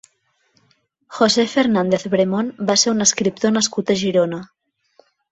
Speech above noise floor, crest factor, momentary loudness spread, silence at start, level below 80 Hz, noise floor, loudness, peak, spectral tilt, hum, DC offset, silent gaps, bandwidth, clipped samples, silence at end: 47 dB; 18 dB; 6 LU; 1.1 s; -60 dBFS; -65 dBFS; -17 LUFS; -2 dBFS; -3.5 dB/octave; none; under 0.1%; none; 8.4 kHz; under 0.1%; 0.85 s